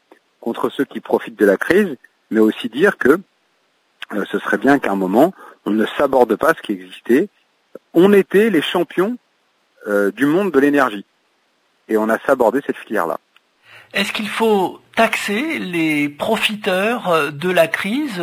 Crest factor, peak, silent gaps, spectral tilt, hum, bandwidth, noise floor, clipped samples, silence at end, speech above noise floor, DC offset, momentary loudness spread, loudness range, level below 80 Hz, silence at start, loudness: 18 dB; 0 dBFS; none; -5.5 dB/octave; none; 16 kHz; -62 dBFS; under 0.1%; 0 s; 46 dB; under 0.1%; 10 LU; 3 LU; -60 dBFS; 0.4 s; -17 LUFS